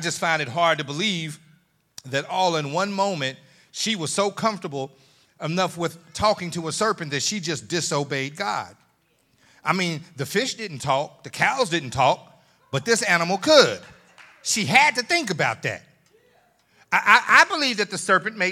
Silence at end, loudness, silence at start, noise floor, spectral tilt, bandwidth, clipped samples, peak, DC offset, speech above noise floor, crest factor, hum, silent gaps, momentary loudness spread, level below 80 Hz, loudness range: 0 s; -22 LUFS; 0 s; -65 dBFS; -3 dB/octave; 17.5 kHz; under 0.1%; 0 dBFS; under 0.1%; 42 dB; 24 dB; none; none; 14 LU; -64 dBFS; 7 LU